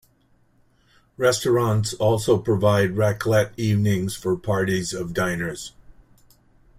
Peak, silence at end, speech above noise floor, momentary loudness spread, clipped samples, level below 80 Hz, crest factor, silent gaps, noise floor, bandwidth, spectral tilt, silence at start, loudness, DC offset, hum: -4 dBFS; 0.85 s; 40 dB; 7 LU; under 0.1%; -52 dBFS; 18 dB; none; -61 dBFS; 16 kHz; -5.5 dB/octave; 1.2 s; -22 LUFS; under 0.1%; none